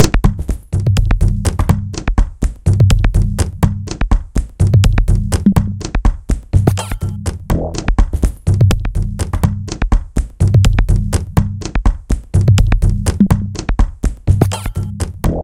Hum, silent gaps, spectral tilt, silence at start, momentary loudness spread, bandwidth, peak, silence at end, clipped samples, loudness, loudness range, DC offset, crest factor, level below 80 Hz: none; none; -6.5 dB/octave; 0 s; 9 LU; 15.5 kHz; 0 dBFS; 0 s; 0.1%; -16 LUFS; 2 LU; under 0.1%; 14 dB; -16 dBFS